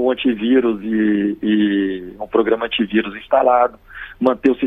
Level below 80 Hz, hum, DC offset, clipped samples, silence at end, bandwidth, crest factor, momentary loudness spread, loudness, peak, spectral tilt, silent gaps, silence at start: -48 dBFS; none; under 0.1%; under 0.1%; 0 s; 4.2 kHz; 16 dB; 6 LU; -17 LUFS; 0 dBFS; -8 dB/octave; none; 0 s